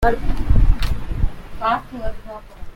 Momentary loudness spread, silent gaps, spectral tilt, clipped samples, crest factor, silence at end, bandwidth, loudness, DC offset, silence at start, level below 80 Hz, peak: 16 LU; none; -7 dB/octave; under 0.1%; 16 dB; 0 s; 6.2 kHz; -23 LUFS; under 0.1%; 0 s; -20 dBFS; -2 dBFS